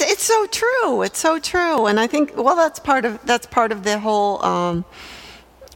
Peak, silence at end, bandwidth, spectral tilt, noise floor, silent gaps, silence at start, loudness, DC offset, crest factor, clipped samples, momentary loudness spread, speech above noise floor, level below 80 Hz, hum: -2 dBFS; 0.1 s; 17.5 kHz; -3 dB/octave; -43 dBFS; none; 0 s; -18 LUFS; under 0.1%; 16 dB; under 0.1%; 7 LU; 24 dB; -52 dBFS; none